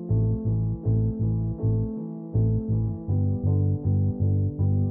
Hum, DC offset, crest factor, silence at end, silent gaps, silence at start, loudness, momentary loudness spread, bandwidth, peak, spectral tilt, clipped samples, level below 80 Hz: none; under 0.1%; 10 dB; 0 s; none; 0 s; -26 LUFS; 3 LU; 1.2 kHz; -14 dBFS; -16 dB/octave; under 0.1%; -38 dBFS